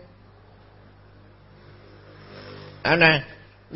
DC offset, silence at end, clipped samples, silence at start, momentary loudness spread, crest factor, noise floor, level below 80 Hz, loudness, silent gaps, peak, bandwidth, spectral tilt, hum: under 0.1%; 0 s; under 0.1%; 2.35 s; 26 LU; 26 dB; -51 dBFS; -56 dBFS; -19 LUFS; none; 0 dBFS; 5.8 kHz; -9 dB/octave; 50 Hz at -50 dBFS